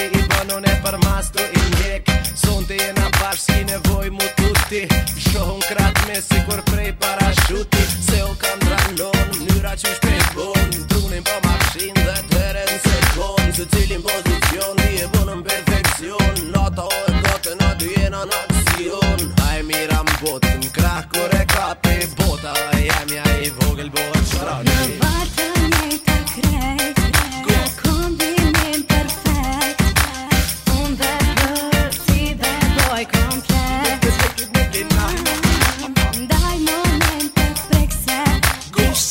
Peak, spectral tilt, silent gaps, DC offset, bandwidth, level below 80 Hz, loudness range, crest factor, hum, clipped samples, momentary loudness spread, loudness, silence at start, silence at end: 0 dBFS; -4 dB/octave; none; 0.2%; over 20 kHz; -24 dBFS; 1 LU; 18 dB; none; under 0.1%; 3 LU; -18 LUFS; 0 s; 0 s